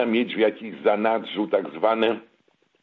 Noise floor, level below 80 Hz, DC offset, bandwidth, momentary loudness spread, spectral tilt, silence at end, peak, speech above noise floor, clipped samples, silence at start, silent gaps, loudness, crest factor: -65 dBFS; -74 dBFS; under 0.1%; 5 kHz; 4 LU; -7.5 dB/octave; 0.6 s; -6 dBFS; 42 dB; under 0.1%; 0 s; none; -23 LUFS; 18 dB